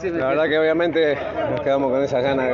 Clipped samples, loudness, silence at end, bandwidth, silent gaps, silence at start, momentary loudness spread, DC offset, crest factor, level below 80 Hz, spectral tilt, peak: under 0.1%; -20 LUFS; 0 s; 7.2 kHz; none; 0 s; 5 LU; under 0.1%; 12 dB; -50 dBFS; -4 dB/octave; -8 dBFS